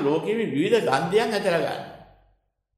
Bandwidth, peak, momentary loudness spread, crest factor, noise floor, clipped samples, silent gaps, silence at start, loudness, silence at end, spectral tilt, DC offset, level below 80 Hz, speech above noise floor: 14 kHz; -8 dBFS; 10 LU; 18 dB; -68 dBFS; under 0.1%; none; 0 s; -23 LUFS; 0.75 s; -5.5 dB/octave; under 0.1%; -64 dBFS; 45 dB